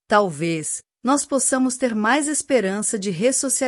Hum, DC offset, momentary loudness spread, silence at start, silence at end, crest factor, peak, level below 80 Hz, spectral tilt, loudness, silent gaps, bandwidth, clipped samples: none; under 0.1%; 6 LU; 0.1 s; 0 s; 18 dB; -4 dBFS; -64 dBFS; -3.5 dB/octave; -20 LUFS; none; 14 kHz; under 0.1%